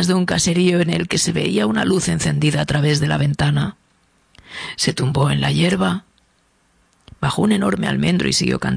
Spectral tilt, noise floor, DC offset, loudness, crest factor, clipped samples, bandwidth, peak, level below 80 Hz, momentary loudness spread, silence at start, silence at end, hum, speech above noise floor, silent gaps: -5 dB/octave; -60 dBFS; under 0.1%; -18 LUFS; 16 dB; under 0.1%; 11 kHz; -4 dBFS; -44 dBFS; 6 LU; 0 s; 0 s; none; 43 dB; none